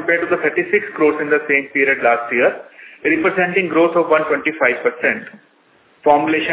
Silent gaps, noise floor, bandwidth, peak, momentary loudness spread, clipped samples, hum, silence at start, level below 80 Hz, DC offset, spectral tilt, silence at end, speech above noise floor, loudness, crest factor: none; -54 dBFS; 4 kHz; 0 dBFS; 5 LU; under 0.1%; none; 0 s; -60 dBFS; under 0.1%; -8.5 dB/octave; 0 s; 38 dB; -16 LUFS; 16 dB